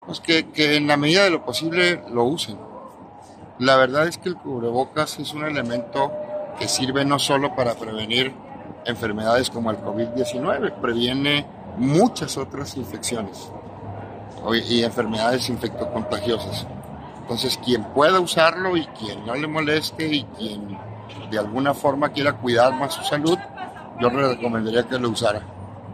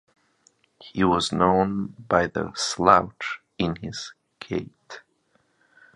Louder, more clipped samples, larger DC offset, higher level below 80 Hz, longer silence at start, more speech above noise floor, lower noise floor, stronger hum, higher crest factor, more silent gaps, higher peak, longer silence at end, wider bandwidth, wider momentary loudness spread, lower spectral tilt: about the same, -22 LUFS vs -23 LUFS; neither; neither; second, -56 dBFS vs -50 dBFS; second, 0 s vs 0.85 s; second, 21 dB vs 44 dB; second, -43 dBFS vs -67 dBFS; neither; about the same, 20 dB vs 24 dB; neither; about the same, -2 dBFS vs 0 dBFS; second, 0 s vs 0.95 s; first, 15.5 kHz vs 11 kHz; second, 17 LU vs 22 LU; about the same, -4.5 dB/octave vs -5 dB/octave